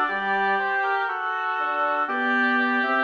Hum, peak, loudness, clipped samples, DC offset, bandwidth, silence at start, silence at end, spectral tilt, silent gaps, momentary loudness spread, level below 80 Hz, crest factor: none; -10 dBFS; -23 LUFS; under 0.1%; under 0.1%; 7 kHz; 0 s; 0 s; -5 dB/octave; none; 4 LU; -74 dBFS; 12 dB